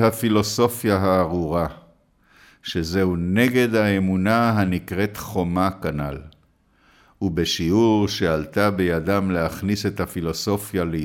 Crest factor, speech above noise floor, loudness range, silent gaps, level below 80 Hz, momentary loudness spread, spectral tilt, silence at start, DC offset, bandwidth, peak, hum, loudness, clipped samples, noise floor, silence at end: 16 dB; 39 dB; 3 LU; none; -44 dBFS; 8 LU; -6 dB/octave; 0 s; under 0.1%; 18 kHz; -6 dBFS; none; -21 LUFS; under 0.1%; -60 dBFS; 0 s